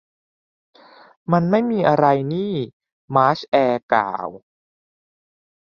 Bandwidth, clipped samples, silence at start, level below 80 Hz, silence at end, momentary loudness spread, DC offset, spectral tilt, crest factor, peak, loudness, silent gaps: 7 kHz; under 0.1%; 1.3 s; -62 dBFS; 1.25 s; 12 LU; under 0.1%; -8.5 dB/octave; 20 dB; -2 dBFS; -19 LUFS; 2.73-2.80 s, 2.92-3.08 s, 3.48-3.52 s, 3.83-3.89 s